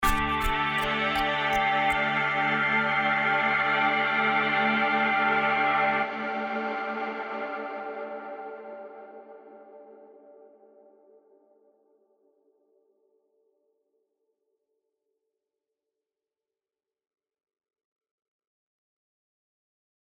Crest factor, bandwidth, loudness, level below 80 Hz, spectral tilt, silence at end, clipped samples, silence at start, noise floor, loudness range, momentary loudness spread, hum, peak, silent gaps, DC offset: 20 dB; 15.5 kHz; -25 LUFS; -46 dBFS; -4 dB/octave; 9.75 s; under 0.1%; 0 s; under -90 dBFS; 17 LU; 15 LU; none; -10 dBFS; none; under 0.1%